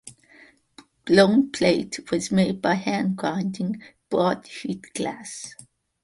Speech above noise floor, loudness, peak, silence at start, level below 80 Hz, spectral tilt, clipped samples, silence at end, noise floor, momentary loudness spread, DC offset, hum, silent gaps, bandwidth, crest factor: 31 dB; -23 LUFS; -4 dBFS; 0.05 s; -60 dBFS; -5.5 dB/octave; under 0.1%; 0.55 s; -54 dBFS; 17 LU; under 0.1%; none; none; 11.5 kHz; 20 dB